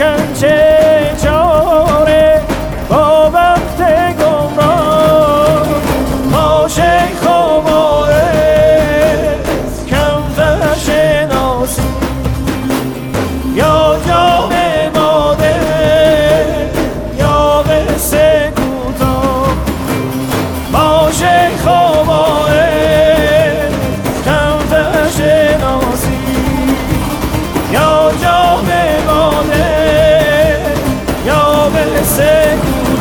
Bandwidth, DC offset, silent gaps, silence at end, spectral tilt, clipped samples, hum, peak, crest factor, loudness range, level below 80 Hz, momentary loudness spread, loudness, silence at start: 19.5 kHz; under 0.1%; none; 0 s; -5 dB/octave; under 0.1%; none; 0 dBFS; 10 dB; 3 LU; -24 dBFS; 7 LU; -11 LUFS; 0 s